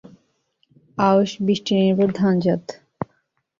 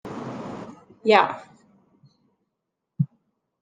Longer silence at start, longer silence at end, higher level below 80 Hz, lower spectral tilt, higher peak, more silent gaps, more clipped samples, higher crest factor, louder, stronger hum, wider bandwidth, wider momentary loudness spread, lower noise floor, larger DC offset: first, 1 s vs 0.05 s; about the same, 0.55 s vs 0.55 s; first, -60 dBFS vs -70 dBFS; about the same, -7 dB/octave vs -6.5 dB/octave; about the same, -4 dBFS vs -2 dBFS; neither; neither; second, 18 dB vs 26 dB; first, -19 LUFS vs -24 LUFS; neither; second, 7.4 kHz vs 9.4 kHz; second, 16 LU vs 21 LU; second, -68 dBFS vs -81 dBFS; neither